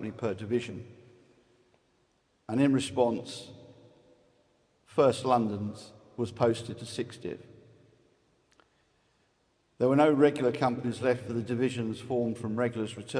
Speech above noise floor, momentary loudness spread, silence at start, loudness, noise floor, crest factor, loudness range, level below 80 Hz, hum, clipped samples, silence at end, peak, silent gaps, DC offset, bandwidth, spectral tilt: 43 dB; 17 LU; 0 s; -29 LUFS; -71 dBFS; 20 dB; 8 LU; -70 dBFS; none; under 0.1%; 0 s; -10 dBFS; none; under 0.1%; 10.5 kHz; -6.5 dB/octave